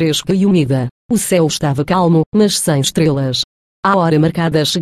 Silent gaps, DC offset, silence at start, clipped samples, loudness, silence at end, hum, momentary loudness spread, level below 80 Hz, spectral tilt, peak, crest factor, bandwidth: 0.91-1.09 s, 2.26-2.32 s, 3.44-3.83 s; under 0.1%; 0 s; under 0.1%; -14 LUFS; 0 s; none; 6 LU; -46 dBFS; -5 dB/octave; -2 dBFS; 12 dB; 15.5 kHz